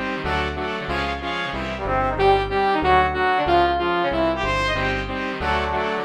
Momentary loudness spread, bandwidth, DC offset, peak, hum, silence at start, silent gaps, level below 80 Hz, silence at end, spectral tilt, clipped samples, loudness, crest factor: 7 LU; 11.5 kHz; under 0.1%; -4 dBFS; none; 0 s; none; -34 dBFS; 0 s; -5.5 dB/octave; under 0.1%; -21 LUFS; 16 dB